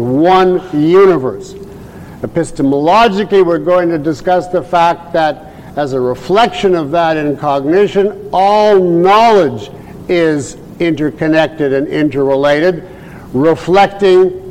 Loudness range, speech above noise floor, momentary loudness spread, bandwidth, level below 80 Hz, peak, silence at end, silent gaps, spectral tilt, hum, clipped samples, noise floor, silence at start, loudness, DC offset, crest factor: 3 LU; 20 dB; 16 LU; 10.5 kHz; -42 dBFS; -2 dBFS; 0 s; none; -6.5 dB/octave; none; under 0.1%; -31 dBFS; 0 s; -11 LUFS; 0.2%; 10 dB